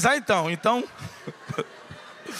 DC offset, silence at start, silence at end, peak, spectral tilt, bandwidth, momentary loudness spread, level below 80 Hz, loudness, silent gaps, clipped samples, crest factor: under 0.1%; 0 s; 0 s; -4 dBFS; -4 dB/octave; 15.5 kHz; 19 LU; -64 dBFS; -25 LUFS; none; under 0.1%; 22 dB